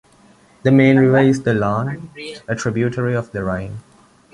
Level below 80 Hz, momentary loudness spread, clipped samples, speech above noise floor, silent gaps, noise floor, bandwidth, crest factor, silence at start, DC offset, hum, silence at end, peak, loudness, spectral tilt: -48 dBFS; 19 LU; under 0.1%; 34 dB; none; -50 dBFS; 11 kHz; 16 dB; 0.65 s; under 0.1%; none; 0.55 s; -2 dBFS; -17 LUFS; -7.5 dB/octave